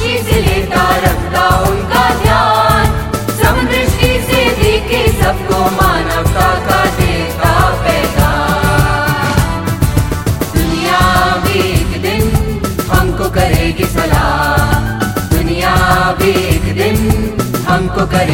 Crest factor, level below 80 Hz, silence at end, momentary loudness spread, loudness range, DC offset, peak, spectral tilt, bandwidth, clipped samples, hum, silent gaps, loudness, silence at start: 12 dB; -20 dBFS; 0 s; 4 LU; 2 LU; under 0.1%; 0 dBFS; -5 dB/octave; 17 kHz; under 0.1%; none; none; -12 LUFS; 0 s